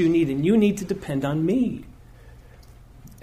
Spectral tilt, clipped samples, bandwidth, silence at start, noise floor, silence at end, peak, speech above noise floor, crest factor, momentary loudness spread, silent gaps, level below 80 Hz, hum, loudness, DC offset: -7.5 dB/octave; under 0.1%; 15 kHz; 0 s; -47 dBFS; 0.1 s; -10 dBFS; 25 dB; 14 dB; 9 LU; none; -48 dBFS; none; -22 LUFS; under 0.1%